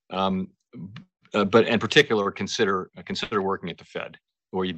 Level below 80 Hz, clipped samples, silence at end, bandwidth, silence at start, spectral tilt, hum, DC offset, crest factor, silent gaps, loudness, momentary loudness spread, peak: -62 dBFS; under 0.1%; 0 s; 8.4 kHz; 0.1 s; -4.5 dB/octave; none; under 0.1%; 22 dB; none; -24 LUFS; 20 LU; -4 dBFS